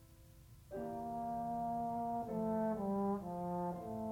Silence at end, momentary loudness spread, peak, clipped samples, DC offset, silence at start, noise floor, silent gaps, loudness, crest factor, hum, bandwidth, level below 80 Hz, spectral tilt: 0 s; 6 LU; -28 dBFS; under 0.1%; under 0.1%; 0 s; -60 dBFS; none; -40 LUFS; 12 dB; none; 19 kHz; -64 dBFS; -9 dB/octave